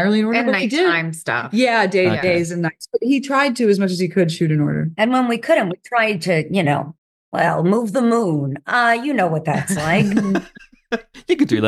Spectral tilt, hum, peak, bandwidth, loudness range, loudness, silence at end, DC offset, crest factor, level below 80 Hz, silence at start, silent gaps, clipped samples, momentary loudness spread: -6 dB/octave; none; -4 dBFS; 12.5 kHz; 1 LU; -18 LUFS; 0 s; under 0.1%; 14 dB; -56 dBFS; 0 s; 6.98-7.32 s; under 0.1%; 7 LU